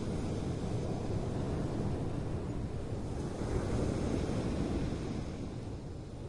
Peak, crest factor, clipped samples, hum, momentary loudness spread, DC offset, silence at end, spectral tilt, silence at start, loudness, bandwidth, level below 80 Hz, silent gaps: -22 dBFS; 14 dB; under 0.1%; none; 7 LU; under 0.1%; 0 s; -7.5 dB/octave; 0 s; -37 LUFS; 11.5 kHz; -44 dBFS; none